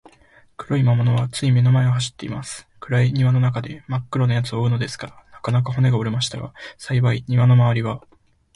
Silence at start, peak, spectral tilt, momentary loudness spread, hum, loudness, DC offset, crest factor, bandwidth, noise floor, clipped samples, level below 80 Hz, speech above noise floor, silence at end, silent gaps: 0.6 s; -6 dBFS; -6.5 dB/octave; 17 LU; none; -20 LUFS; under 0.1%; 14 dB; 11.5 kHz; -53 dBFS; under 0.1%; -50 dBFS; 34 dB; 0.55 s; none